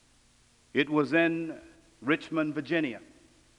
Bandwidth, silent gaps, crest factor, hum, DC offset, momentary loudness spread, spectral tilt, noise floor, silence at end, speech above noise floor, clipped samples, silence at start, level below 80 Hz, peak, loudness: 10.5 kHz; none; 20 dB; none; under 0.1%; 14 LU; -6.5 dB/octave; -63 dBFS; 0.55 s; 35 dB; under 0.1%; 0.75 s; -68 dBFS; -10 dBFS; -29 LUFS